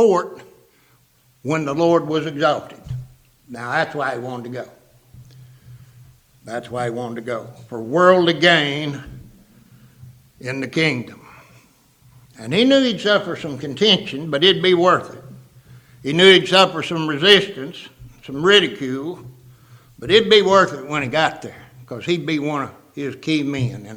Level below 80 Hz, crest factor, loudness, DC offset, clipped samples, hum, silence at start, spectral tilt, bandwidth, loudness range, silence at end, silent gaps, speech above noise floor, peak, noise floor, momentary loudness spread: -56 dBFS; 20 dB; -17 LUFS; under 0.1%; under 0.1%; none; 0 s; -4.5 dB/octave; 14.5 kHz; 12 LU; 0 s; none; 39 dB; 0 dBFS; -57 dBFS; 20 LU